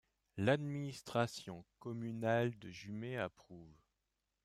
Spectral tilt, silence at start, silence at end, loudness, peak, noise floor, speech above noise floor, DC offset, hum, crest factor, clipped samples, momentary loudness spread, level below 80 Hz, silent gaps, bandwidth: -6 dB/octave; 0.35 s; 0.7 s; -40 LUFS; -20 dBFS; -87 dBFS; 48 dB; under 0.1%; none; 20 dB; under 0.1%; 17 LU; -74 dBFS; none; 14 kHz